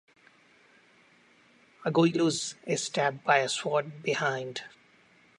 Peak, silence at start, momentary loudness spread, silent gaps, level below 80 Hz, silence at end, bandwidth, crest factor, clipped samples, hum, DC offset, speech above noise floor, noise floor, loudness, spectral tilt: -8 dBFS; 1.8 s; 11 LU; none; -80 dBFS; 0.7 s; 11.5 kHz; 22 dB; under 0.1%; none; under 0.1%; 33 dB; -61 dBFS; -28 LUFS; -4 dB/octave